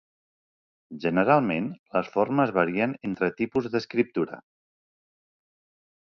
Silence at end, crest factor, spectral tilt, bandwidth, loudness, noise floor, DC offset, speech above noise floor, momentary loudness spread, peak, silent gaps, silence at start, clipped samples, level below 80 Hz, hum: 1.65 s; 22 dB; -8 dB/octave; 6.8 kHz; -26 LUFS; under -90 dBFS; under 0.1%; over 65 dB; 9 LU; -6 dBFS; 1.79-1.86 s; 0.9 s; under 0.1%; -64 dBFS; none